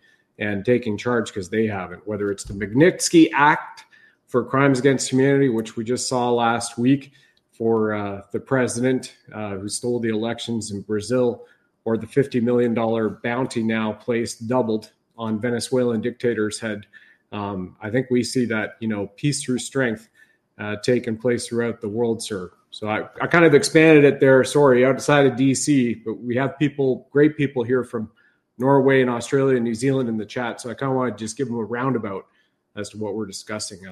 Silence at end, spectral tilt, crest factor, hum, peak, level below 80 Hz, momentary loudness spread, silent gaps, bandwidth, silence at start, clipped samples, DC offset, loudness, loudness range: 0 s; -5.5 dB/octave; 20 dB; none; 0 dBFS; -58 dBFS; 14 LU; none; 13 kHz; 0.4 s; under 0.1%; under 0.1%; -21 LUFS; 8 LU